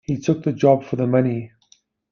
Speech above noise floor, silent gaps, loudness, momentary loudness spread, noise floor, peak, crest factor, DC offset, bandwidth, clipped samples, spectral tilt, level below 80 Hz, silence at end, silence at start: 40 dB; none; -20 LUFS; 10 LU; -59 dBFS; -2 dBFS; 18 dB; under 0.1%; 7 kHz; under 0.1%; -8 dB/octave; -56 dBFS; 0.65 s; 0.1 s